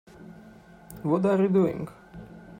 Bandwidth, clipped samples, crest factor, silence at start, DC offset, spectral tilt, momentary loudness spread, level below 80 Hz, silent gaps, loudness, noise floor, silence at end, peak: 16 kHz; under 0.1%; 16 dB; 0.2 s; under 0.1%; -9 dB/octave; 25 LU; -58 dBFS; none; -25 LUFS; -50 dBFS; 0 s; -12 dBFS